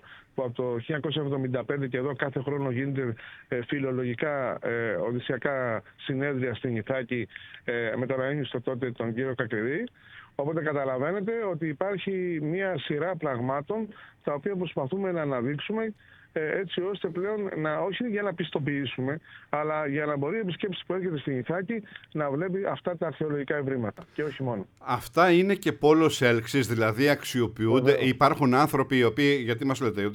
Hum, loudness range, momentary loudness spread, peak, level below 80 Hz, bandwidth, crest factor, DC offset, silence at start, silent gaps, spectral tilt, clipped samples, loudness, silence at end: none; 7 LU; 11 LU; -6 dBFS; -64 dBFS; 19 kHz; 22 dB; under 0.1%; 0.05 s; none; -6.5 dB/octave; under 0.1%; -28 LUFS; 0 s